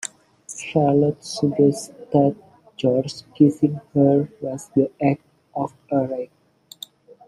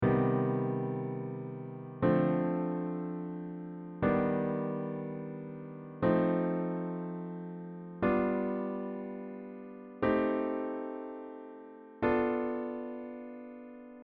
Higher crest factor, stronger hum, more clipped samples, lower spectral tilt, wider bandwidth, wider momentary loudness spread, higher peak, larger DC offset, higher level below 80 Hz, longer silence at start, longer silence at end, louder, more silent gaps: about the same, 18 dB vs 18 dB; neither; neither; about the same, -7 dB/octave vs -8 dB/octave; first, 14 kHz vs 4.8 kHz; about the same, 18 LU vs 16 LU; first, -2 dBFS vs -14 dBFS; neither; about the same, -62 dBFS vs -60 dBFS; about the same, 0.05 s vs 0 s; first, 1 s vs 0 s; first, -21 LUFS vs -34 LUFS; neither